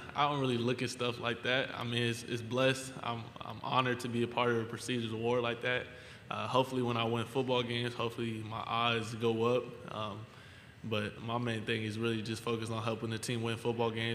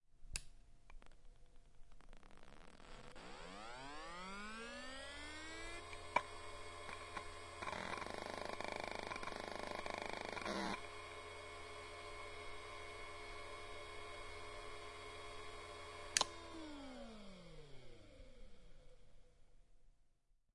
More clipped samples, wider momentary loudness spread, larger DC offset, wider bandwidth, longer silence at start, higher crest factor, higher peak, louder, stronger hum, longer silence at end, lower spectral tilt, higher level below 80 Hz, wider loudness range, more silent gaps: neither; second, 9 LU vs 20 LU; neither; first, 15.5 kHz vs 11.5 kHz; about the same, 0 s vs 0 s; second, 22 dB vs 34 dB; first, -12 dBFS vs -16 dBFS; first, -34 LUFS vs -48 LUFS; neither; about the same, 0 s vs 0.05 s; first, -5 dB/octave vs -2.5 dB/octave; second, -68 dBFS vs -62 dBFS; second, 3 LU vs 12 LU; neither